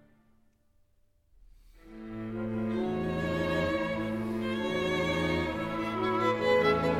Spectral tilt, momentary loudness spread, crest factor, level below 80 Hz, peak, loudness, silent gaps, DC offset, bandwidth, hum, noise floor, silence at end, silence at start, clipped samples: -6.5 dB/octave; 10 LU; 18 dB; -52 dBFS; -12 dBFS; -30 LUFS; none; under 0.1%; 15.5 kHz; none; -67 dBFS; 0 s; 1.85 s; under 0.1%